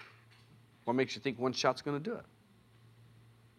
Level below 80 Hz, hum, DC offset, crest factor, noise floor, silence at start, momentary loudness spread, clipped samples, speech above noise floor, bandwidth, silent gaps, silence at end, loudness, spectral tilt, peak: -78 dBFS; none; under 0.1%; 24 dB; -63 dBFS; 0 s; 12 LU; under 0.1%; 29 dB; 13.5 kHz; none; 1.35 s; -35 LUFS; -5 dB/octave; -14 dBFS